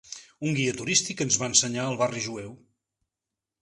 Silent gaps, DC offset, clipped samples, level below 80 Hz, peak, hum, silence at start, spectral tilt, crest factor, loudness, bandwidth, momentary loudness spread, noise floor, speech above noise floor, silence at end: none; under 0.1%; under 0.1%; -64 dBFS; -4 dBFS; none; 0.05 s; -2.5 dB/octave; 24 dB; -25 LUFS; 11.5 kHz; 16 LU; -88 dBFS; 61 dB; 1.05 s